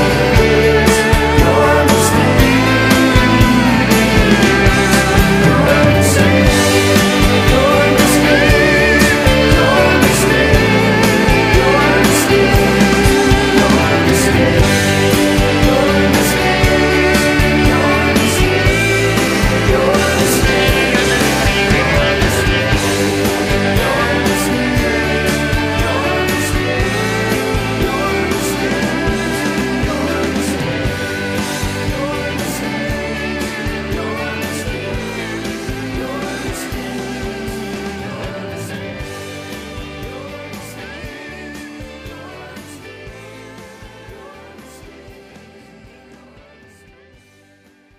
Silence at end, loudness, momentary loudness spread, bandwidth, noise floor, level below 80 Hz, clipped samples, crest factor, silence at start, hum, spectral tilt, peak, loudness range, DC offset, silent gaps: 2.85 s; -12 LUFS; 16 LU; 15.5 kHz; -49 dBFS; -24 dBFS; under 0.1%; 14 dB; 0 s; none; -4.5 dB/octave; 0 dBFS; 16 LU; under 0.1%; none